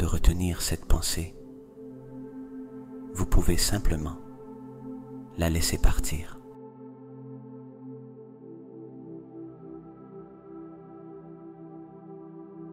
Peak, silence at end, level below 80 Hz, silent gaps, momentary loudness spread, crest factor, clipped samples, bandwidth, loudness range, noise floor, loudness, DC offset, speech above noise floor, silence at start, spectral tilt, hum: -6 dBFS; 0 s; -32 dBFS; none; 19 LU; 22 dB; under 0.1%; 16 kHz; 15 LU; -46 dBFS; -30 LUFS; under 0.1%; 23 dB; 0 s; -4.5 dB/octave; none